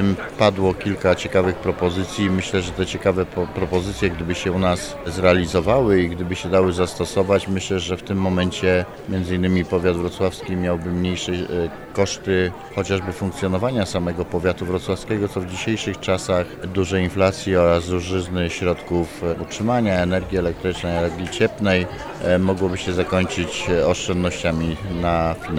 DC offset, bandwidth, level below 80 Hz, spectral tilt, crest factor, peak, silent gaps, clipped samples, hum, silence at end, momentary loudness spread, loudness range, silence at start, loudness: under 0.1%; 14.5 kHz; -40 dBFS; -5.5 dB/octave; 18 dB; -2 dBFS; none; under 0.1%; none; 0 s; 6 LU; 3 LU; 0 s; -21 LUFS